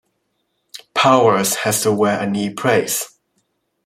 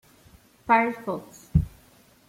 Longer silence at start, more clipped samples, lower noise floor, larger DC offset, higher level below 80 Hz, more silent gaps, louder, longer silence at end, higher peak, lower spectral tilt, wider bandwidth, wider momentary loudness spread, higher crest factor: about the same, 0.75 s vs 0.65 s; neither; first, -70 dBFS vs -57 dBFS; neither; second, -62 dBFS vs -42 dBFS; neither; first, -16 LUFS vs -26 LUFS; first, 0.8 s vs 0.6 s; first, -2 dBFS vs -6 dBFS; second, -3.5 dB/octave vs -7.5 dB/octave; about the same, 16.5 kHz vs 16 kHz; about the same, 14 LU vs 15 LU; second, 16 dB vs 22 dB